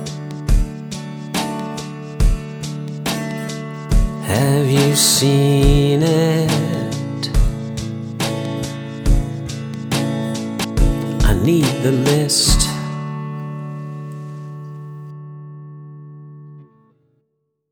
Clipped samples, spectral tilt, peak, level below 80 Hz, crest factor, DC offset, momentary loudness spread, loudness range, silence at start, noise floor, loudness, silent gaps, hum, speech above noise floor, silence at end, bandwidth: under 0.1%; -5 dB/octave; 0 dBFS; -24 dBFS; 18 dB; under 0.1%; 19 LU; 16 LU; 0 s; -70 dBFS; -18 LUFS; none; none; 56 dB; 1.05 s; over 20 kHz